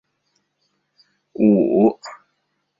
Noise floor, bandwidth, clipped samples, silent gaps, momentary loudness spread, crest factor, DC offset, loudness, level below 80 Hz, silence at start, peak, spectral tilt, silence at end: -71 dBFS; 7.4 kHz; under 0.1%; none; 24 LU; 18 dB; under 0.1%; -17 LUFS; -64 dBFS; 1.4 s; -4 dBFS; -9 dB/octave; 0.65 s